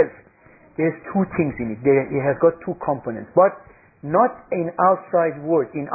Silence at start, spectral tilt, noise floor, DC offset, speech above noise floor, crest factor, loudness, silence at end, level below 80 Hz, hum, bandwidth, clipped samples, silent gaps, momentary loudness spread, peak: 0 s; -15.5 dB/octave; -51 dBFS; under 0.1%; 31 dB; 18 dB; -21 LUFS; 0 s; -54 dBFS; none; 2.7 kHz; under 0.1%; none; 8 LU; -4 dBFS